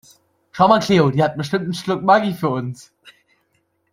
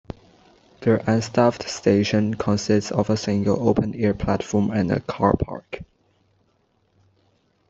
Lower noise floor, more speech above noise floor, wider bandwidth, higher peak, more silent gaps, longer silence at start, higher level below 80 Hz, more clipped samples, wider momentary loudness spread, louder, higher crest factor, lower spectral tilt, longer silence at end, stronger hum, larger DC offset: about the same, -67 dBFS vs -65 dBFS; first, 49 dB vs 45 dB; first, 16 kHz vs 8 kHz; about the same, -2 dBFS vs -2 dBFS; neither; second, 0.55 s vs 0.8 s; second, -56 dBFS vs -46 dBFS; neither; first, 14 LU vs 9 LU; first, -17 LUFS vs -22 LUFS; about the same, 18 dB vs 20 dB; about the same, -6.5 dB/octave vs -6.5 dB/octave; second, 0.8 s vs 1.85 s; neither; neither